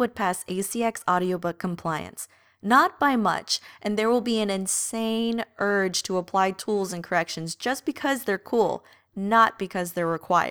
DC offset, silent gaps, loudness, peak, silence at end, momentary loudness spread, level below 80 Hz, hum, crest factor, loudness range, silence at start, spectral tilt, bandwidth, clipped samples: under 0.1%; none; -25 LUFS; -6 dBFS; 0 s; 10 LU; -66 dBFS; none; 18 dB; 2 LU; 0 s; -3.5 dB/octave; over 20 kHz; under 0.1%